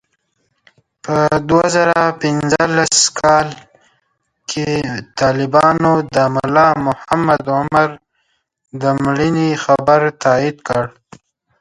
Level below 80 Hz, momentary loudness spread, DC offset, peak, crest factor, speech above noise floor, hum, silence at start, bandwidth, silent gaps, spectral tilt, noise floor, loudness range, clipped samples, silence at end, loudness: -48 dBFS; 8 LU; under 0.1%; 0 dBFS; 16 dB; 52 dB; none; 1.05 s; 11.5 kHz; none; -4.5 dB/octave; -66 dBFS; 2 LU; under 0.1%; 0.7 s; -14 LUFS